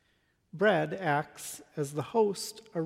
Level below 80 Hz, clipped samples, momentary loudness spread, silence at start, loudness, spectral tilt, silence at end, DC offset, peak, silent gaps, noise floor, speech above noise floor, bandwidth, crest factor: -76 dBFS; under 0.1%; 13 LU; 0.55 s; -31 LUFS; -5 dB/octave; 0 s; under 0.1%; -12 dBFS; none; -72 dBFS; 41 dB; 16 kHz; 18 dB